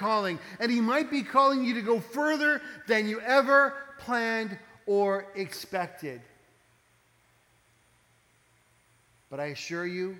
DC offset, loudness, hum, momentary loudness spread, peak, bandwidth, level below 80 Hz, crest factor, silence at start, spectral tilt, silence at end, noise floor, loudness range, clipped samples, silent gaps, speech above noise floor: under 0.1%; -27 LUFS; none; 15 LU; -8 dBFS; 19 kHz; -76 dBFS; 20 dB; 0 s; -4.5 dB/octave; 0 s; -66 dBFS; 16 LU; under 0.1%; none; 38 dB